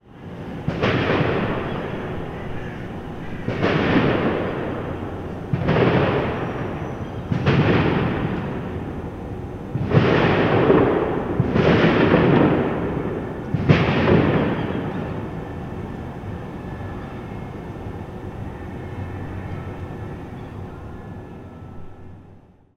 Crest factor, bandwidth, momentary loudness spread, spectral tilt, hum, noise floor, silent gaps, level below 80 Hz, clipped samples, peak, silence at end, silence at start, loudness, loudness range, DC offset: 20 dB; 7.4 kHz; 17 LU; -8.5 dB/octave; none; -48 dBFS; none; -40 dBFS; under 0.1%; -2 dBFS; 0.4 s; 0.05 s; -22 LUFS; 14 LU; under 0.1%